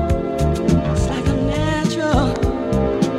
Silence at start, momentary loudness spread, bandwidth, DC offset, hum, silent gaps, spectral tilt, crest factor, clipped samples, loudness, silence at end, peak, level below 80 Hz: 0 s; 2 LU; 13.5 kHz; under 0.1%; none; none; -6.5 dB/octave; 16 dB; under 0.1%; -19 LUFS; 0 s; -2 dBFS; -26 dBFS